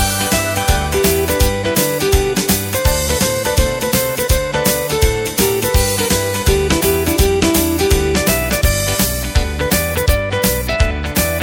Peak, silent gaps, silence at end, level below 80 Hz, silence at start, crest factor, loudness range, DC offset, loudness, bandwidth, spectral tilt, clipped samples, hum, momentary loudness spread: 0 dBFS; none; 0 s; -22 dBFS; 0 s; 14 dB; 1 LU; under 0.1%; -15 LUFS; 17 kHz; -4 dB/octave; under 0.1%; none; 2 LU